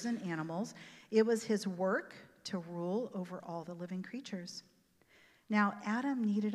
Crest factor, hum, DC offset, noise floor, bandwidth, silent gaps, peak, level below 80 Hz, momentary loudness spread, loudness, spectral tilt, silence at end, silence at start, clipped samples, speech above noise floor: 20 dB; none; under 0.1%; -68 dBFS; 12.5 kHz; none; -16 dBFS; -86 dBFS; 12 LU; -37 LUFS; -6 dB/octave; 0 s; 0 s; under 0.1%; 32 dB